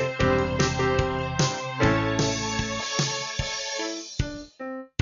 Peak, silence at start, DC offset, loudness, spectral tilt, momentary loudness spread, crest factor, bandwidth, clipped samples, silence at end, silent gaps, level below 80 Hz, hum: -8 dBFS; 0 s; under 0.1%; -26 LUFS; -4 dB/octave; 10 LU; 18 dB; 7.4 kHz; under 0.1%; 0.15 s; none; -40 dBFS; none